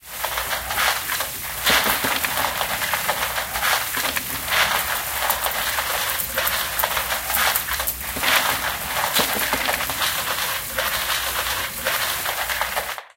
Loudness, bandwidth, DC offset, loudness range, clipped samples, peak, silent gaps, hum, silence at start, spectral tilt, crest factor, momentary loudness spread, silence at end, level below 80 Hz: -21 LUFS; 17 kHz; under 0.1%; 1 LU; under 0.1%; -2 dBFS; none; none; 0.05 s; -0.5 dB/octave; 20 dB; 5 LU; 0.1 s; -44 dBFS